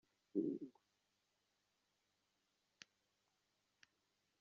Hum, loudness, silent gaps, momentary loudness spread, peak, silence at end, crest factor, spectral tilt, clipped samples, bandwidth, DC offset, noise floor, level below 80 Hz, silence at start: 50 Hz at -95 dBFS; -46 LUFS; none; 21 LU; -28 dBFS; 3.7 s; 26 dB; -7 dB/octave; under 0.1%; 7.2 kHz; under 0.1%; -86 dBFS; under -90 dBFS; 0.35 s